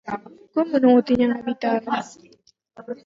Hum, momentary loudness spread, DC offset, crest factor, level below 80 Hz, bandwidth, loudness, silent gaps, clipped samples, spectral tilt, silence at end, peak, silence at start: none; 17 LU; under 0.1%; 16 dB; -58 dBFS; 7.6 kHz; -21 LUFS; none; under 0.1%; -6 dB/octave; 0.1 s; -6 dBFS; 0.05 s